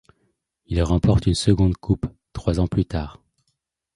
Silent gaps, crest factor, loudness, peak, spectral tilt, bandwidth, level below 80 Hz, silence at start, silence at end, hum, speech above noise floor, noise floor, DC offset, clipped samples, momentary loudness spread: none; 20 dB; -22 LUFS; -4 dBFS; -7 dB/octave; 11.5 kHz; -32 dBFS; 0.7 s; 0.85 s; none; 54 dB; -74 dBFS; under 0.1%; under 0.1%; 10 LU